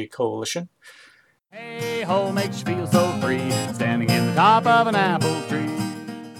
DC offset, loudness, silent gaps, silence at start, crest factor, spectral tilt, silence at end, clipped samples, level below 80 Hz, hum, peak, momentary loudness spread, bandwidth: under 0.1%; -21 LUFS; none; 0 s; 18 dB; -5 dB/octave; 0 s; under 0.1%; -64 dBFS; none; -4 dBFS; 14 LU; 18 kHz